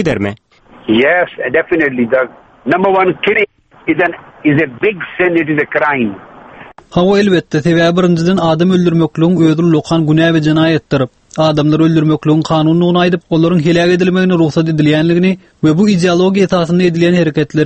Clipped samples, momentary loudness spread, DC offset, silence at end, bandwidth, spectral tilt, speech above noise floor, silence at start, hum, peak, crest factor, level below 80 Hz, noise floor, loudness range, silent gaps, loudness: under 0.1%; 6 LU; under 0.1%; 0 s; 8.6 kHz; -7 dB/octave; 25 dB; 0 s; none; 0 dBFS; 12 dB; -46 dBFS; -36 dBFS; 3 LU; none; -12 LUFS